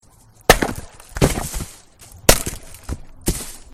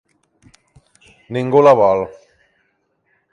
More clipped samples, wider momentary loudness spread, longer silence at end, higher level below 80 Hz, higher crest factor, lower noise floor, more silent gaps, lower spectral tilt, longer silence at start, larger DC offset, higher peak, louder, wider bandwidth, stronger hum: neither; first, 20 LU vs 16 LU; second, 0.1 s vs 1.2 s; first, -30 dBFS vs -56 dBFS; about the same, 22 dB vs 18 dB; second, -44 dBFS vs -66 dBFS; neither; second, -3 dB/octave vs -7.5 dB/octave; second, 0.5 s vs 1.3 s; neither; about the same, 0 dBFS vs 0 dBFS; second, -19 LUFS vs -14 LUFS; first, 16 kHz vs 9.8 kHz; neither